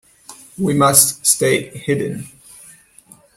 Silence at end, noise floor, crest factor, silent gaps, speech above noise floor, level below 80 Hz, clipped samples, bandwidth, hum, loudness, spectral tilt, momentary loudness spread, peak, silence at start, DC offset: 1.1 s; -48 dBFS; 18 dB; none; 32 dB; -54 dBFS; under 0.1%; 16.5 kHz; none; -15 LUFS; -3 dB/octave; 21 LU; 0 dBFS; 0.3 s; under 0.1%